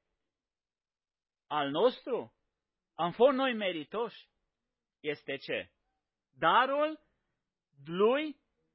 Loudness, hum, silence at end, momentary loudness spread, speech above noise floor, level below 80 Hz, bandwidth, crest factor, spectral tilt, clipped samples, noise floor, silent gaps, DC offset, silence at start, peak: -31 LUFS; none; 0.4 s; 15 LU; over 59 dB; -78 dBFS; 5.6 kHz; 22 dB; -2.5 dB/octave; under 0.1%; under -90 dBFS; none; under 0.1%; 1.5 s; -12 dBFS